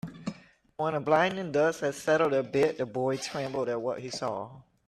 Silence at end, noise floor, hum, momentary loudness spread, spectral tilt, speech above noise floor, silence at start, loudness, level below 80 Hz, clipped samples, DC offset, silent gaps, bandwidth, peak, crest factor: 0.25 s; -49 dBFS; none; 14 LU; -5 dB/octave; 21 dB; 0.05 s; -29 LUFS; -68 dBFS; under 0.1%; under 0.1%; none; 13.5 kHz; -10 dBFS; 20 dB